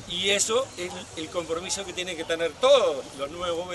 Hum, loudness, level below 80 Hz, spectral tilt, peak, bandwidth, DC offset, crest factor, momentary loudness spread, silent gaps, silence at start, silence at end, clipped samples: none; -26 LUFS; -56 dBFS; -2 dB/octave; -8 dBFS; 12 kHz; under 0.1%; 18 dB; 14 LU; none; 0 s; 0 s; under 0.1%